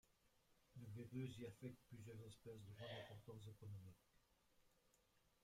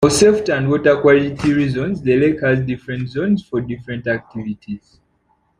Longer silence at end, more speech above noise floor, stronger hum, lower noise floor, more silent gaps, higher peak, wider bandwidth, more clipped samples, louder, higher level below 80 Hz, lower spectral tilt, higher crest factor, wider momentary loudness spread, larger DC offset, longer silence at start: second, 0.15 s vs 0.8 s; second, 24 dB vs 45 dB; neither; first, -81 dBFS vs -62 dBFS; neither; second, -40 dBFS vs 0 dBFS; first, 16 kHz vs 14 kHz; neither; second, -58 LUFS vs -17 LUFS; second, -82 dBFS vs -46 dBFS; about the same, -6.5 dB/octave vs -5.5 dB/octave; about the same, 18 dB vs 16 dB; second, 9 LU vs 15 LU; neither; about the same, 0.05 s vs 0 s